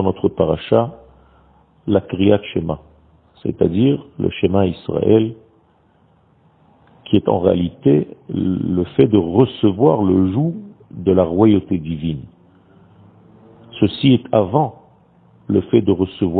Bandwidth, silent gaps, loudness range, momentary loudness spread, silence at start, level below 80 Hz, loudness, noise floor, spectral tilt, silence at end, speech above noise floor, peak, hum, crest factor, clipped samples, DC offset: 4.5 kHz; none; 4 LU; 11 LU; 0 s; -46 dBFS; -17 LUFS; -55 dBFS; -11.5 dB/octave; 0 s; 39 dB; 0 dBFS; none; 18 dB; under 0.1%; under 0.1%